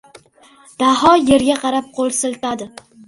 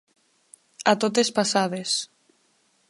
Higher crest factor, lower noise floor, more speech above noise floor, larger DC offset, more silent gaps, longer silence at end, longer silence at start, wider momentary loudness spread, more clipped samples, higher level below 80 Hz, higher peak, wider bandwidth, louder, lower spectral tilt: about the same, 18 dB vs 22 dB; second, -48 dBFS vs -66 dBFS; second, 33 dB vs 43 dB; neither; neither; second, 0.4 s vs 0.85 s; about the same, 0.8 s vs 0.8 s; first, 13 LU vs 6 LU; neither; first, -48 dBFS vs -76 dBFS; first, 0 dBFS vs -4 dBFS; about the same, 11.5 kHz vs 11.5 kHz; first, -15 LUFS vs -23 LUFS; about the same, -3.5 dB/octave vs -3 dB/octave